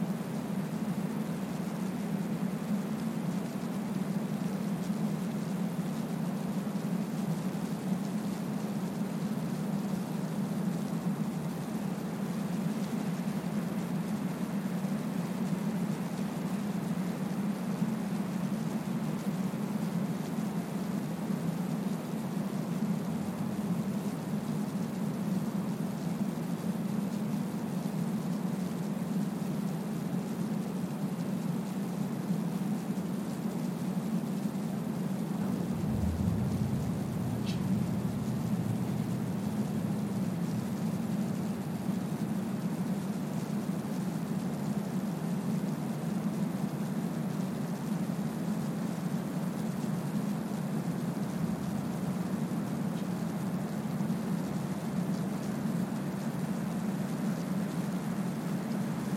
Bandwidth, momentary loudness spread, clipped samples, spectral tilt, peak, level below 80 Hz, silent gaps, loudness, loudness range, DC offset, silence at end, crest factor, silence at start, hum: 16.5 kHz; 2 LU; under 0.1%; -7 dB/octave; -18 dBFS; -60 dBFS; none; -34 LUFS; 1 LU; under 0.1%; 0 s; 14 dB; 0 s; none